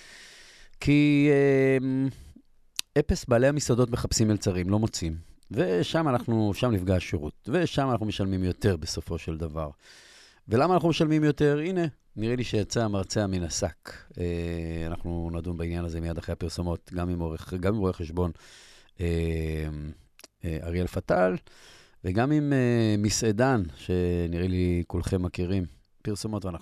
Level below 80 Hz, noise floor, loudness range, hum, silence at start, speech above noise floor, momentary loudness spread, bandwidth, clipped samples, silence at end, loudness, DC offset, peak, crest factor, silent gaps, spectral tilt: -46 dBFS; -55 dBFS; 6 LU; none; 0 s; 28 dB; 11 LU; 13.5 kHz; under 0.1%; 0.05 s; -27 LUFS; under 0.1%; -6 dBFS; 22 dB; none; -6 dB/octave